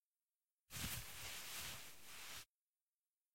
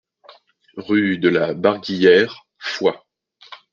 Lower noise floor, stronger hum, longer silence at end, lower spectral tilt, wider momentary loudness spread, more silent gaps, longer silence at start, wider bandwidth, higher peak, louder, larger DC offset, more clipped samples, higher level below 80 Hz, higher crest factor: first, under -90 dBFS vs -49 dBFS; neither; second, 0 s vs 0.2 s; second, -1.5 dB/octave vs -6 dB/octave; second, 9 LU vs 19 LU; first, 0.05-0.11 s, 0.36-0.57 s, 2.49-2.65 s, 2.81-3.00 s, 3.21-3.30 s vs none; second, 0 s vs 0.75 s; first, 16.5 kHz vs 7.2 kHz; second, -32 dBFS vs -2 dBFS; second, -50 LUFS vs -18 LUFS; neither; neither; about the same, -68 dBFS vs -64 dBFS; about the same, 22 dB vs 18 dB